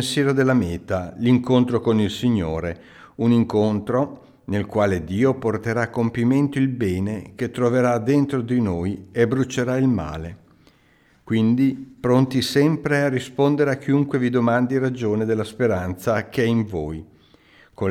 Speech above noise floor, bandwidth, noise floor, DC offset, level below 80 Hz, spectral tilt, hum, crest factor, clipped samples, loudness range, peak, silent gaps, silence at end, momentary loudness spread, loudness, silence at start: 37 dB; 14.5 kHz; -57 dBFS; under 0.1%; -48 dBFS; -7 dB/octave; none; 16 dB; under 0.1%; 3 LU; -4 dBFS; none; 0 s; 9 LU; -21 LUFS; 0 s